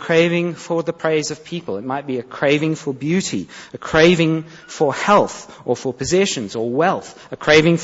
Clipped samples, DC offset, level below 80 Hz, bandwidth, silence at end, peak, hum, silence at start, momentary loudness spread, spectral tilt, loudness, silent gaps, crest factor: under 0.1%; under 0.1%; -50 dBFS; 8 kHz; 0 s; 0 dBFS; none; 0 s; 13 LU; -5 dB/octave; -18 LUFS; none; 18 dB